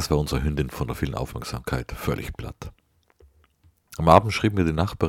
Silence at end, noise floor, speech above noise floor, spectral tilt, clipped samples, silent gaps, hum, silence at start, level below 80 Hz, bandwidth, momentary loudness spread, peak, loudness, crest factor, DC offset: 0 s; -61 dBFS; 37 dB; -6 dB/octave; under 0.1%; none; none; 0 s; -36 dBFS; 17 kHz; 20 LU; 0 dBFS; -24 LUFS; 24 dB; under 0.1%